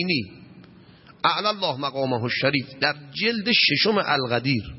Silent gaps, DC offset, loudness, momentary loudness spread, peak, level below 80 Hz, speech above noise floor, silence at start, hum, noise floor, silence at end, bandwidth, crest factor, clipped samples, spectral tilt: none; under 0.1%; -22 LUFS; 8 LU; -6 dBFS; -56 dBFS; 26 dB; 0 s; none; -50 dBFS; 0 s; 6 kHz; 18 dB; under 0.1%; -7.5 dB/octave